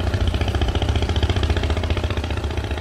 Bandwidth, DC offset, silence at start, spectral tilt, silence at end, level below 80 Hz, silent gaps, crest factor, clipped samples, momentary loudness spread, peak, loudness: 12 kHz; under 0.1%; 0 s; -6 dB/octave; 0 s; -24 dBFS; none; 14 dB; under 0.1%; 4 LU; -8 dBFS; -22 LUFS